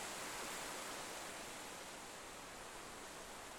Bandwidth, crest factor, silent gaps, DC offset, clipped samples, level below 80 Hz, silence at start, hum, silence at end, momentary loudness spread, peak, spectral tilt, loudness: 19 kHz; 16 dB; none; under 0.1%; under 0.1%; -70 dBFS; 0 s; none; 0 s; 6 LU; -34 dBFS; -1.5 dB/octave; -48 LUFS